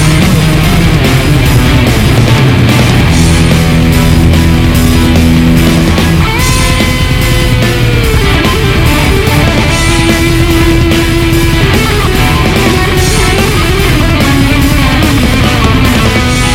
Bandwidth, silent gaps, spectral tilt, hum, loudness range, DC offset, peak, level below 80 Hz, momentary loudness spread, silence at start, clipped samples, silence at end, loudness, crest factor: 17 kHz; none; -5 dB/octave; none; 1 LU; under 0.1%; 0 dBFS; -14 dBFS; 2 LU; 0 s; 0.4%; 0 s; -7 LUFS; 6 dB